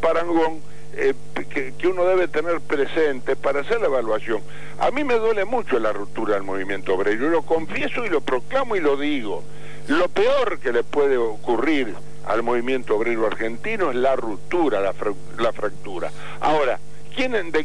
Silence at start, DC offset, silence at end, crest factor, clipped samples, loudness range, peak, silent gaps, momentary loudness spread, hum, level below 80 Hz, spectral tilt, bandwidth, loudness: 0 s; 6%; 0 s; 14 dB; under 0.1%; 2 LU; -8 dBFS; none; 9 LU; 50 Hz at -50 dBFS; -54 dBFS; -5.5 dB/octave; 10.5 kHz; -23 LUFS